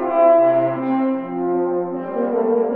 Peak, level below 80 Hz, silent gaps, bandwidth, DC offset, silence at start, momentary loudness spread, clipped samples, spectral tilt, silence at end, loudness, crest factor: -4 dBFS; -72 dBFS; none; 3.9 kHz; under 0.1%; 0 s; 10 LU; under 0.1%; -11.5 dB/octave; 0 s; -18 LUFS; 14 dB